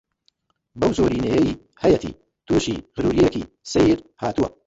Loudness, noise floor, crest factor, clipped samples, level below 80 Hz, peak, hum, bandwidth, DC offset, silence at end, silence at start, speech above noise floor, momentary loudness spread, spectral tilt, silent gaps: -21 LUFS; -67 dBFS; 16 dB; under 0.1%; -42 dBFS; -4 dBFS; none; 8 kHz; under 0.1%; 0.2 s; 0.75 s; 47 dB; 7 LU; -6 dB/octave; none